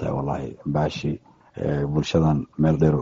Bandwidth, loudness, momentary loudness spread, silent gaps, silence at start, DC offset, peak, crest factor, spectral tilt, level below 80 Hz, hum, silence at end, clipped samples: 7.6 kHz; -24 LUFS; 10 LU; none; 0 s; under 0.1%; -4 dBFS; 18 dB; -7.5 dB/octave; -42 dBFS; none; 0 s; under 0.1%